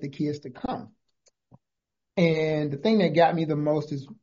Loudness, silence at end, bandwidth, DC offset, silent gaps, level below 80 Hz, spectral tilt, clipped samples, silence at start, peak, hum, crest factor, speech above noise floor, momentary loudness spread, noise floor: -25 LUFS; 0.1 s; 7.4 kHz; under 0.1%; none; -62 dBFS; -6 dB/octave; under 0.1%; 0 s; -8 dBFS; none; 20 dB; 61 dB; 13 LU; -86 dBFS